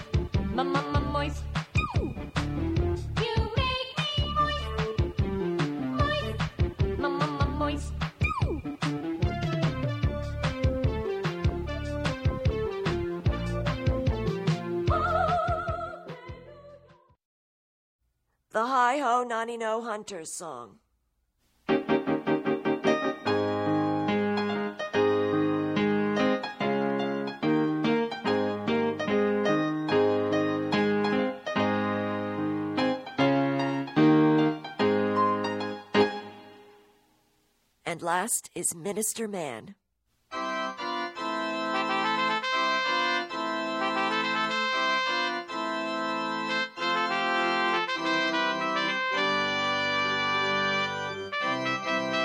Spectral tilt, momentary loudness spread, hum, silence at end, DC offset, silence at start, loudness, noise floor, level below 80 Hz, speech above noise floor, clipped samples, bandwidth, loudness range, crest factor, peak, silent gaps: -5 dB/octave; 7 LU; none; 0 s; under 0.1%; 0 s; -28 LUFS; -76 dBFS; -42 dBFS; 45 dB; under 0.1%; 16 kHz; 5 LU; 18 dB; -10 dBFS; 17.25-17.99 s